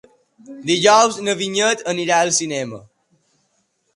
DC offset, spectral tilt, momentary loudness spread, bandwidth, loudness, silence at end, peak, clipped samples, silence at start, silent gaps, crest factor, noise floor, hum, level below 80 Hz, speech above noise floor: under 0.1%; -2.5 dB/octave; 15 LU; 11.5 kHz; -17 LUFS; 1.15 s; 0 dBFS; under 0.1%; 0.5 s; none; 20 dB; -67 dBFS; none; -66 dBFS; 49 dB